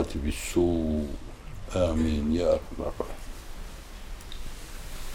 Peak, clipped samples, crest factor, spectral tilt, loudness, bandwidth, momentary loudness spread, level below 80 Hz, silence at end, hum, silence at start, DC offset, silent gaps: -12 dBFS; under 0.1%; 18 dB; -6 dB/octave; -28 LUFS; 17 kHz; 18 LU; -38 dBFS; 0 s; none; 0 s; under 0.1%; none